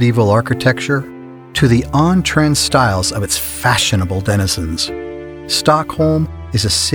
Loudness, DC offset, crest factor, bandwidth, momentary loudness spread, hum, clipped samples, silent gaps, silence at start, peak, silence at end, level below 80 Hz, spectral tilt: -15 LUFS; under 0.1%; 14 dB; over 20 kHz; 8 LU; none; under 0.1%; none; 0 s; 0 dBFS; 0 s; -36 dBFS; -4.5 dB/octave